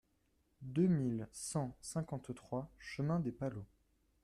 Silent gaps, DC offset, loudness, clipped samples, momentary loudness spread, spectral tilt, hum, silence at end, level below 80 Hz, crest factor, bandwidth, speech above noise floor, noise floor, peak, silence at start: none; under 0.1%; -39 LUFS; under 0.1%; 14 LU; -6.5 dB/octave; none; 0.6 s; -66 dBFS; 18 dB; 13 kHz; 39 dB; -77 dBFS; -22 dBFS; 0.6 s